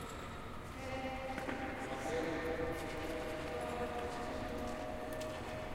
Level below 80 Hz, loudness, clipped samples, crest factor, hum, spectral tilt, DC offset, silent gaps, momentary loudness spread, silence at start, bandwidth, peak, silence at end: -54 dBFS; -42 LUFS; under 0.1%; 16 dB; none; -5 dB/octave; under 0.1%; none; 6 LU; 0 s; 16 kHz; -24 dBFS; 0 s